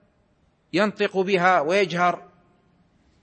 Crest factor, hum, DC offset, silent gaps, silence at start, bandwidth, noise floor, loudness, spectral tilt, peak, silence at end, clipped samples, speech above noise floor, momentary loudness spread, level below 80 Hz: 18 dB; none; under 0.1%; none; 0.75 s; 8.8 kHz; -64 dBFS; -21 LUFS; -5.5 dB/octave; -6 dBFS; 1 s; under 0.1%; 43 dB; 7 LU; -70 dBFS